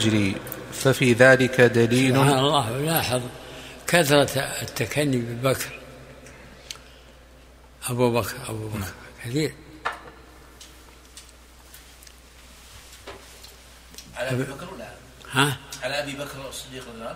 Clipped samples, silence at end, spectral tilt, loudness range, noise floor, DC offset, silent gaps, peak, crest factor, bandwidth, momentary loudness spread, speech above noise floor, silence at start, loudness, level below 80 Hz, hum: under 0.1%; 0 s; -4.5 dB/octave; 21 LU; -49 dBFS; under 0.1%; none; -2 dBFS; 24 dB; 16 kHz; 25 LU; 27 dB; 0 s; -22 LUFS; -52 dBFS; none